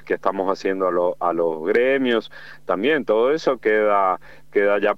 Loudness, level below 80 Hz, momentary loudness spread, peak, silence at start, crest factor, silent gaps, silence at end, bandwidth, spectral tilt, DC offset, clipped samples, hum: -20 LUFS; -62 dBFS; 7 LU; -4 dBFS; 0.05 s; 16 dB; none; 0 s; 7.6 kHz; -5.5 dB/octave; 0.8%; under 0.1%; none